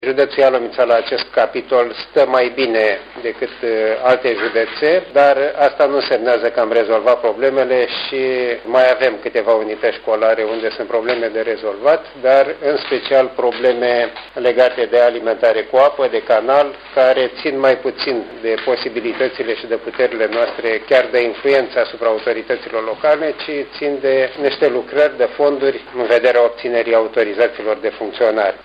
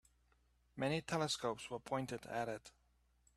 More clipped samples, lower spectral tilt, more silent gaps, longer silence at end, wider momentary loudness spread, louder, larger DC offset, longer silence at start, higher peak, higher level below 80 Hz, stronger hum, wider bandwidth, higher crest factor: neither; about the same, -5.5 dB/octave vs -4.5 dB/octave; neither; second, 0.05 s vs 0.65 s; about the same, 7 LU vs 8 LU; first, -16 LUFS vs -42 LUFS; neither; second, 0 s vs 0.75 s; first, 0 dBFS vs -24 dBFS; first, -56 dBFS vs -72 dBFS; second, none vs 60 Hz at -70 dBFS; second, 6.2 kHz vs 14 kHz; about the same, 16 dB vs 20 dB